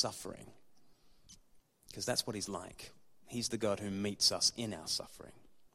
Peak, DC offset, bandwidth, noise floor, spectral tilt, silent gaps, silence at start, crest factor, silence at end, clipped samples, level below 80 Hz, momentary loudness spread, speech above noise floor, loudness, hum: -16 dBFS; under 0.1%; 15.5 kHz; -65 dBFS; -2.5 dB/octave; none; 0 s; 24 dB; 0.05 s; under 0.1%; -66 dBFS; 22 LU; 27 dB; -35 LUFS; none